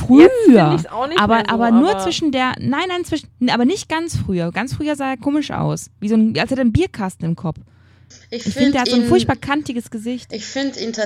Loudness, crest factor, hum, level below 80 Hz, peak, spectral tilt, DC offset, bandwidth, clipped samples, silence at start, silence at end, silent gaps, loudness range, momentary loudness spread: -17 LUFS; 16 dB; none; -44 dBFS; 0 dBFS; -5.5 dB/octave; under 0.1%; 13.5 kHz; under 0.1%; 0 s; 0 s; none; 5 LU; 13 LU